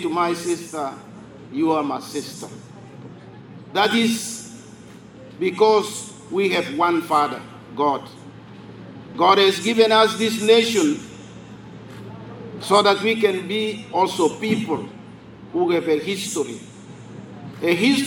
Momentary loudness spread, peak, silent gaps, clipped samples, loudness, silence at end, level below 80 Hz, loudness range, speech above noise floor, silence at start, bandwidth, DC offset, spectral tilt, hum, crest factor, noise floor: 25 LU; -2 dBFS; none; under 0.1%; -20 LUFS; 0 s; -64 dBFS; 7 LU; 22 dB; 0 s; 19.5 kHz; under 0.1%; -4 dB/octave; none; 20 dB; -42 dBFS